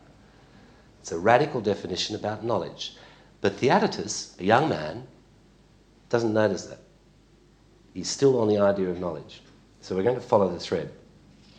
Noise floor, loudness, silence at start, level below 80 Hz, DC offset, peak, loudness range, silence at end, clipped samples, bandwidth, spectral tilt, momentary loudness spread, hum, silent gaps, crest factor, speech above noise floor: -57 dBFS; -25 LUFS; 1.05 s; -60 dBFS; under 0.1%; -4 dBFS; 2 LU; 0.65 s; under 0.1%; 9.6 kHz; -5 dB/octave; 15 LU; 50 Hz at -55 dBFS; none; 24 dB; 32 dB